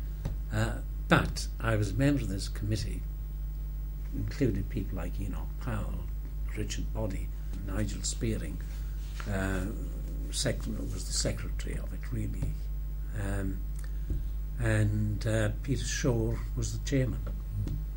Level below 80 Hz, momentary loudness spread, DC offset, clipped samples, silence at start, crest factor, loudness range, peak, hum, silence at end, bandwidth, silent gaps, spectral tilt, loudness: -34 dBFS; 10 LU; under 0.1%; under 0.1%; 0 s; 24 dB; 5 LU; -6 dBFS; none; 0 s; 16.5 kHz; none; -5.5 dB/octave; -33 LUFS